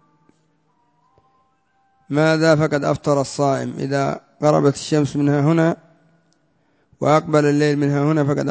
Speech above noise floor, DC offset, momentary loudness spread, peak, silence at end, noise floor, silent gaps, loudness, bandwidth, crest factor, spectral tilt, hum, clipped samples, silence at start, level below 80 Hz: 46 dB; under 0.1%; 7 LU; -2 dBFS; 0 s; -63 dBFS; none; -18 LUFS; 8 kHz; 18 dB; -6.5 dB/octave; none; under 0.1%; 2.1 s; -56 dBFS